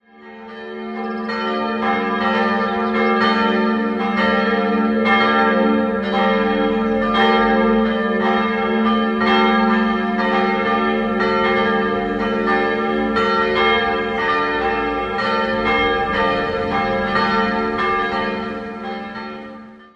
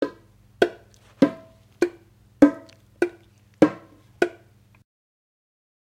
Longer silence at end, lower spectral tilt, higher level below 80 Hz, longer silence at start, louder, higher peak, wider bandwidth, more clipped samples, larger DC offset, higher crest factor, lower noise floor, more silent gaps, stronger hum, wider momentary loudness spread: second, 0.15 s vs 1.6 s; about the same, -6.5 dB/octave vs -6.5 dB/octave; first, -42 dBFS vs -60 dBFS; first, 0.2 s vs 0 s; first, -18 LUFS vs -23 LUFS; about the same, -2 dBFS vs 0 dBFS; second, 7.2 kHz vs 11.5 kHz; neither; neither; second, 16 dB vs 26 dB; second, -38 dBFS vs -55 dBFS; neither; neither; about the same, 10 LU vs 12 LU